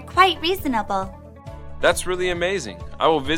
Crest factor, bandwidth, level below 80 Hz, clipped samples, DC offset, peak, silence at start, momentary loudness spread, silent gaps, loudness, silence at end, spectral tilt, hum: 20 dB; 16.5 kHz; -40 dBFS; under 0.1%; under 0.1%; -2 dBFS; 0 s; 22 LU; none; -21 LUFS; 0 s; -3.5 dB/octave; none